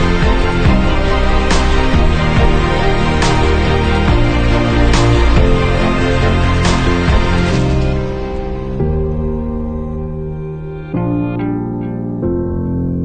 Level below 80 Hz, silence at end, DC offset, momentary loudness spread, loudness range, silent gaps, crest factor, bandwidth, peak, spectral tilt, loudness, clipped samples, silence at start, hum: -16 dBFS; 0 s; 3%; 9 LU; 7 LU; none; 12 dB; 9.4 kHz; 0 dBFS; -6.5 dB/octave; -15 LUFS; under 0.1%; 0 s; none